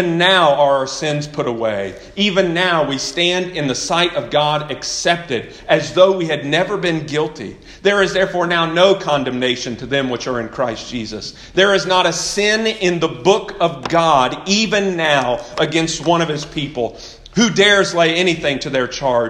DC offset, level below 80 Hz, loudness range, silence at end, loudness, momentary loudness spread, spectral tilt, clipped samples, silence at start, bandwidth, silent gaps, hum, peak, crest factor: under 0.1%; -46 dBFS; 2 LU; 0 s; -16 LUFS; 10 LU; -3.5 dB/octave; under 0.1%; 0 s; 12 kHz; none; none; 0 dBFS; 16 dB